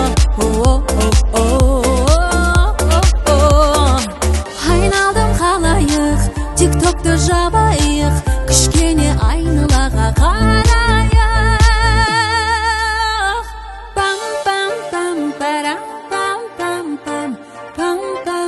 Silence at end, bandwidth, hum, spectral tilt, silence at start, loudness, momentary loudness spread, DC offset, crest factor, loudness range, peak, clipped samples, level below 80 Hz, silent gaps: 0 s; 12.5 kHz; none; -4.5 dB/octave; 0 s; -14 LUFS; 9 LU; under 0.1%; 14 dB; 6 LU; 0 dBFS; under 0.1%; -18 dBFS; none